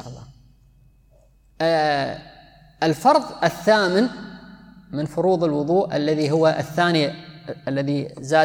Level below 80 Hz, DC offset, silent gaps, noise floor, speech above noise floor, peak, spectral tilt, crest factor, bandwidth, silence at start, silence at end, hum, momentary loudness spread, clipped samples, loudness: -56 dBFS; under 0.1%; none; -55 dBFS; 35 dB; -4 dBFS; -6 dB/octave; 18 dB; 19.5 kHz; 0 s; 0 s; none; 17 LU; under 0.1%; -21 LUFS